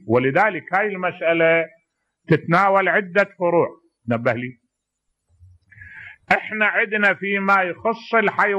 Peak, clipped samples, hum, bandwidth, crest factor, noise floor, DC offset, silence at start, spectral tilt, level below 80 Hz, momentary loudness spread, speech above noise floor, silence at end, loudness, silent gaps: -4 dBFS; under 0.1%; none; 12.5 kHz; 16 dB; -76 dBFS; under 0.1%; 0.05 s; -7 dB/octave; -64 dBFS; 11 LU; 57 dB; 0 s; -19 LUFS; none